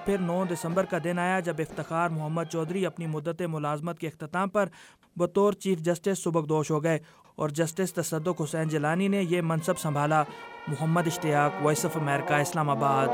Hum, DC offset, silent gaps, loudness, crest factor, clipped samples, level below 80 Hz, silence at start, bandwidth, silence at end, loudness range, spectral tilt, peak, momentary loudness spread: none; under 0.1%; none; -28 LUFS; 18 dB; under 0.1%; -64 dBFS; 0 s; 16.5 kHz; 0 s; 3 LU; -6 dB/octave; -10 dBFS; 7 LU